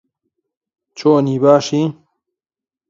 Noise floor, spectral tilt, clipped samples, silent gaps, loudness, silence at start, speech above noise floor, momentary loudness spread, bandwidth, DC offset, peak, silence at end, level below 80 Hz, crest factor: -90 dBFS; -6.5 dB/octave; under 0.1%; none; -15 LUFS; 0.95 s; 77 dB; 7 LU; 7.8 kHz; under 0.1%; 0 dBFS; 0.95 s; -66 dBFS; 18 dB